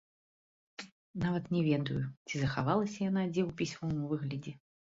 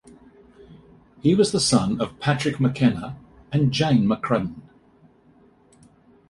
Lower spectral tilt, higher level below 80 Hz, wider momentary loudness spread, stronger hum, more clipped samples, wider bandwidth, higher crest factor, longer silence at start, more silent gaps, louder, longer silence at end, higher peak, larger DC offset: about the same, -6.5 dB/octave vs -5.5 dB/octave; second, -62 dBFS vs -52 dBFS; first, 17 LU vs 11 LU; neither; neither; second, 7.8 kHz vs 11.5 kHz; about the same, 18 dB vs 20 dB; about the same, 0.8 s vs 0.7 s; first, 0.92-1.14 s, 2.17-2.25 s vs none; second, -34 LUFS vs -22 LUFS; second, 0.3 s vs 1.7 s; second, -16 dBFS vs -4 dBFS; neither